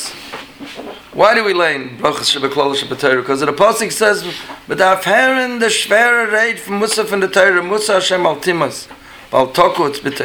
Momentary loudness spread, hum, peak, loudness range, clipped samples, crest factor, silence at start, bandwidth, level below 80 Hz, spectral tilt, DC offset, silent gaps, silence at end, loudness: 16 LU; none; 0 dBFS; 2 LU; under 0.1%; 14 dB; 0 s; over 20 kHz; -54 dBFS; -2.5 dB/octave; under 0.1%; none; 0 s; -14 LUFS